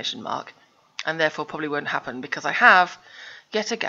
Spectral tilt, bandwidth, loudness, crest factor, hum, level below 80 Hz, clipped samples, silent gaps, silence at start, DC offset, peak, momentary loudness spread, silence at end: -3 dB/octave; 7.8 kHz; -22 LUFS; 24 dB; none; -72 dBFS; under 0.1%; none; 0 s; under 0.1%; 0 dBFS; 22 LU; 0 s